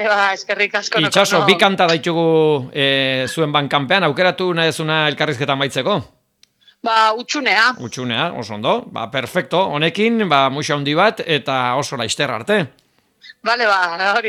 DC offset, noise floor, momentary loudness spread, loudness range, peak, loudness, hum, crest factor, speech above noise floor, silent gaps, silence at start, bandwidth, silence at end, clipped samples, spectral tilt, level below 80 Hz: under 0.1%; -57 dBFS; 7 LU; 3 LU; 0 dBFS; -16 LUFS; none; 18 dB; 40 dB; none; 0 s; 15.5 kHz; 0 s; under 0.1%; -4 dB/octave; -64 dBFS